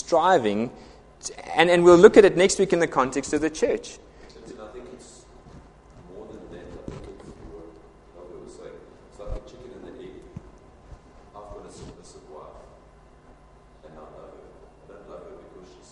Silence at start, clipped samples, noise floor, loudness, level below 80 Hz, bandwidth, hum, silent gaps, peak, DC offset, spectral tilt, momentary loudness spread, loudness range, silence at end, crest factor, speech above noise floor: 0.1 s; under 0.1%; -52 dBFS; -19 LUFS; -50 dBFS; 11.5 kHz; none; none; 0 dBFS; under 0.1%; -4.5 dB/octave; 29 LU; 27 LU; 0.55 s; 24 dB; 33 dB